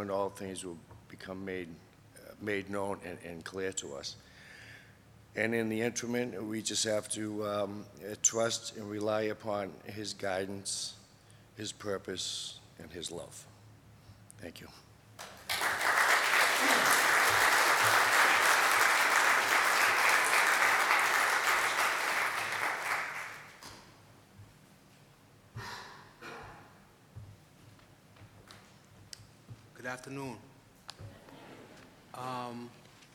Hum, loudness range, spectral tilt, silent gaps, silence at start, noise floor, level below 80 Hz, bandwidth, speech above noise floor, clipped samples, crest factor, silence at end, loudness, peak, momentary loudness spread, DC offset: none; 23 LU; -1.5 dB/octave; none; 0 s; -60 dBFS; -70 dBFS; 19.5 kHz; 23 dB; under 0.1%; 24 dB; 0.45 s; -29 LUFS; -10 dBFS; 24 LU; under 0.1%